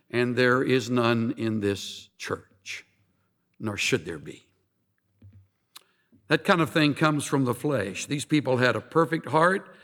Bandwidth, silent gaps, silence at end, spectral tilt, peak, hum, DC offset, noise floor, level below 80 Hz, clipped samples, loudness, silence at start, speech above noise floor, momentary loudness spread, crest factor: 18 kHz; none; 0.1 s; -5 dB/octave; -6 dBFS; none; under 0.1%; -73 dBFS; -70 dBFS; under 0.1%; -25 LUFS; 0.15 s; 48 dB; 15 LU; 20 dB